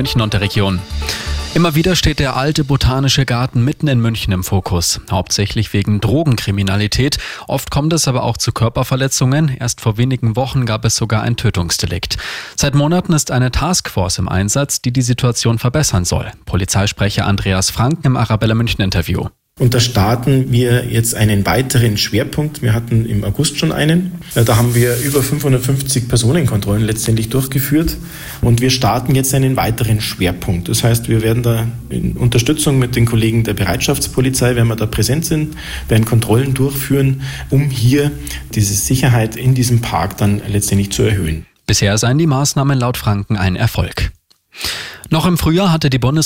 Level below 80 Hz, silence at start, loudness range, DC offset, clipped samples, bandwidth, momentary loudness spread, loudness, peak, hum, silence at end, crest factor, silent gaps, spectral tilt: -30 dBFS; 0 s; 1 LU; under 0.1%; under 0.1%; 17 kHz; 6 LU; -15 LUFS; -2 dBFS; none; 0 s; 12 dB; none; -5 dB/octave